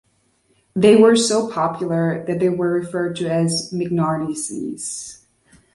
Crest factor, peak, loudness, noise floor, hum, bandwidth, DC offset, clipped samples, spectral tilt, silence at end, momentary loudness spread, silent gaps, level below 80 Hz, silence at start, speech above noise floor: 18 dB; -2 dBFS; -19 LUFS; -62 dBFS; none; 11.5 kHz; under 0.1%; under 0.1%; -5 dB/octave; 0.6 s; 14 LU; none; -58 dBFS; 0.75 s; 44 dB